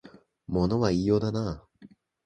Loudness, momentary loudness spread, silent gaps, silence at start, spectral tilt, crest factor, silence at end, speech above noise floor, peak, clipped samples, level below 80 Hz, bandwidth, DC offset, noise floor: -27 LUFS; 10 LU; none; 0.05 s; -7.5 dB/octave; 20 dB; 0.4 s; 29 dB; -8 dBFS; under 0.1%; -46 dBFS; 9.2 kHz; under 0.1%; -55 dBFS